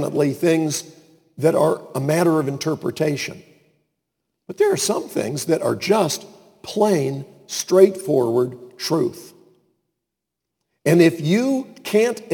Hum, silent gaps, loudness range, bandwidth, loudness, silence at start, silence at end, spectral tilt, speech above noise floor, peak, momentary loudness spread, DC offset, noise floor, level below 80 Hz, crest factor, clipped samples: none; none; 3 LU; 19 kHz; -20 LUFS; 0 s; 0 s; -5 dB/octave; 63 dB; 0 dBFS; 12 LU; under 0.1%; -82 dBFS; -68 dBFS; 20 dB; under 0.1%